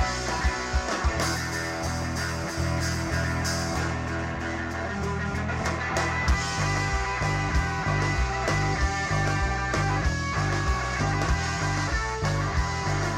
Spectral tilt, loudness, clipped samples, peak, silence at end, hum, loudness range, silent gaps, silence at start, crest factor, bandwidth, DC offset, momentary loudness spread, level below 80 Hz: -4.5 dB/octave; -27 LUFS; under 0.1%; -14 dBFS; 0 s; none; 3 LU; none; 0 s; 12 dB; 16 kHz; under 0.1%; 4 LU; -32 dBFS